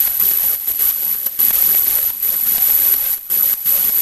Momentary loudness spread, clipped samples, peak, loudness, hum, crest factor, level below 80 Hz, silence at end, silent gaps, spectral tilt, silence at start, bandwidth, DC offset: 4 LU; under 0.1%; -2 dBFS; -12 LUFS; none; 14 dB; -50 dBFS; 0 s; none; 1 dB/octave; 0 s; 16 kHz; under 0.1%